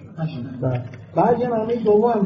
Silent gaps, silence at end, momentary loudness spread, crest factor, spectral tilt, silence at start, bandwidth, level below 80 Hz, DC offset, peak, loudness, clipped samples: none; 0 s; 11 LU; 14 dB; -8 dB/octave; 0 s; 6.2 kHz; -54 dBFS; under 0.1%; -6 dBFS; -21 LUFS; under 0.1%